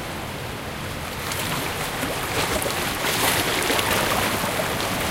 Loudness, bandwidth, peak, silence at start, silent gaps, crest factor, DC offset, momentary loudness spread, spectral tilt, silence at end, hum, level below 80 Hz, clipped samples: -23 LUFS; 17 kHz; -4 dBFS; 0 s; none; 20 dB; under 0.1%; 10 LU; -3 dB/octave; 0 s; none; -42 dBFS; under 0.1%